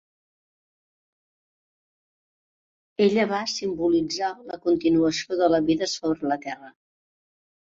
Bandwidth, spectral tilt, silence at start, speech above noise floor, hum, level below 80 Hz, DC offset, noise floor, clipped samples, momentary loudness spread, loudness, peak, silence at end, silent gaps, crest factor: 7.8 kHz; -4.5 dB/octave; 3 s; over 67 dB; none; -60 dBFS; under 0.1%; under -90 dBFS; under 0.1%; 9 LU; -24 LUFS; -8 dBFS; 1.05 s; none; 18 dB